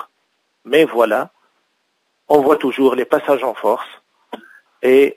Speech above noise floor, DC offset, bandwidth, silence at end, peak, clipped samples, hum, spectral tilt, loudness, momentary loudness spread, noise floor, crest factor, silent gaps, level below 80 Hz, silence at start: 53 dB; under 0.1%; 16 kHz; 0.05 s; 0 dBFS; under 0.1%; none; -5 dB/octave; -16 LUFS; 23 LU; -67 dBFS; 18 dB; none; -68 dBFS; 0 s